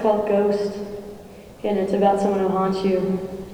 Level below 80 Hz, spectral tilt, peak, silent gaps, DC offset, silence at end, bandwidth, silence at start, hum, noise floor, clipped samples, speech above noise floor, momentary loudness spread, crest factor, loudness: -52 dBFS; -7.5 dB/octave; -6 dBFS; none; under 0.1%; 0 s; over 20 kHz; 0 s; none; -41 dBFS; under 0.1%; 21 dB; 15 LU; 16 dB; -22 LUFS